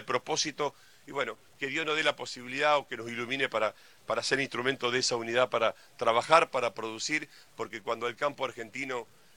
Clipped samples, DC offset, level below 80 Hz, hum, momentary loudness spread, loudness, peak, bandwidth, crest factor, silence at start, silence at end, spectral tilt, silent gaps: under 0.1%; under 0.1%; -72 dBFS; none; 11 LU; -30 LUFS; -6 dBFS; 17 kHz; 26 dB; 0 s; 0.35 s; -2.5 dB/octave; none